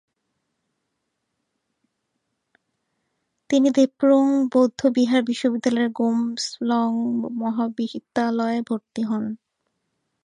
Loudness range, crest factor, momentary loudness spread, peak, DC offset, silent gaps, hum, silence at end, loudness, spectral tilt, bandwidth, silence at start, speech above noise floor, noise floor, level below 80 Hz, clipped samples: 6 LU; 18 dB; 9 LU; -6 dBFS; under 0.1%; none; none; 0.9 s; -22 LUFS; -5 dB/octave; 10.5 kHz; 3.5 s; 56 dB; -77 dBFS; -72 dBFS; under 0.1%